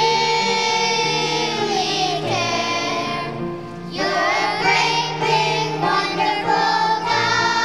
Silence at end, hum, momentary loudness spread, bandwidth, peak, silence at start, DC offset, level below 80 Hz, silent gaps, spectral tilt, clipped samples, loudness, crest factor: 0 s; none; 7 LU; 13.5 kHz; -4 dBFS; 0 s; 0.4%; -54 dBFS; none; -3 dB/octave; under 0.1%; -19 LUFS; 16 dB